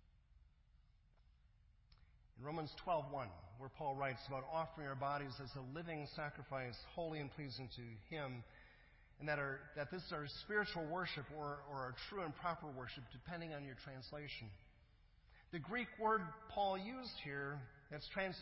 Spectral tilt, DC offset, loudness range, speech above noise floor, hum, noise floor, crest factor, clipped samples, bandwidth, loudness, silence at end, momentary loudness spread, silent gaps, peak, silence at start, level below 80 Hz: -3.5 dB/octave; under 0.1%; 5 LU; 25 dB; none; -71 dBFS; 20 dB; under 0.1%; 5.6 kHz; -46 LUFS; 0 s; 12 LU; none; -26 dBFS; 0.15 s; -68 dBFS